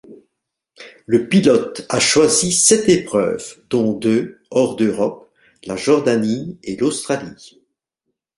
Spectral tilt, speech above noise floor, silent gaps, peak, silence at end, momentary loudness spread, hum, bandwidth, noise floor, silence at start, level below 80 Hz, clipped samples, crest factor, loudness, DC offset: -3.5 dB/octave; 60 dB; none; 0 dBFS; 0.9 s; 12 LU; none; 11.5 kHz; -77 dBFS; 0.1 s; -56 dBFS; under 0.1%; 18 dB; -17 LUFS; under 0.1%